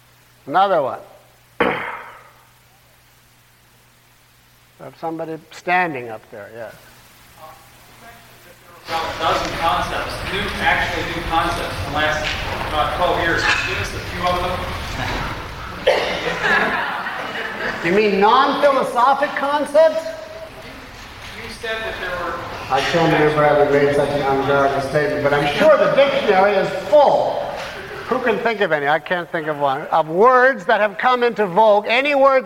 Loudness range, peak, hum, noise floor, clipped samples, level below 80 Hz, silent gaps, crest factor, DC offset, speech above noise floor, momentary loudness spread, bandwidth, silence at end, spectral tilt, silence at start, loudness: 11 LU; -2 dBFS; none; -52 dBFS; under 0.1%; -40 dBFS; none; 16 dB; under 0.1%; 35 dB; 16 LU; 17 kHz; 0 s; -5 dB/octave; 0.45 s; -18 LUFS